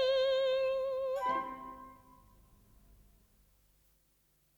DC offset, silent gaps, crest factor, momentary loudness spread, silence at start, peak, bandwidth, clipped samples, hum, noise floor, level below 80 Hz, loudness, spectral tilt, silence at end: under 0.1%; none; 14 dB; 20 LU; 0 s; -22 dBFS; 19 kHz; under 0.1%; none; -73 dBFS; -66 dBFS; -33 LUFS; -3.5 dB/octave; 2.6 s